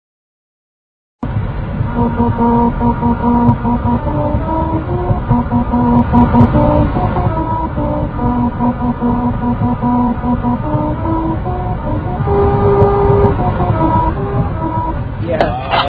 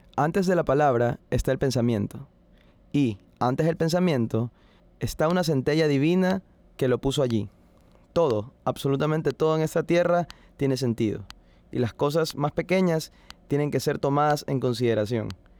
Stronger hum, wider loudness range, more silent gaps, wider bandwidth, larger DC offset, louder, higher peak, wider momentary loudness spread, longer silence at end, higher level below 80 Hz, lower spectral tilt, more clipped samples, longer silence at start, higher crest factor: neither; about the same, 3 LU vs 2 LU; neither; second, 4.9 kHz vs 20 kHz; neither; first, -14 LUFS vs -25 LUFS; first, 0 dBFS vs -10 dBFS; about the same, 8 LU vs 8 LU; second, 0 s vs 0.25 s; first, -22 dBFS vs -48 dBFS; first, -11 dB/octave vs -6.5 dB/octave; first, 0.1% vs under 0.1%; first, 1.25 s vs 0.15 s; about the same, 14 dB vs 14 dB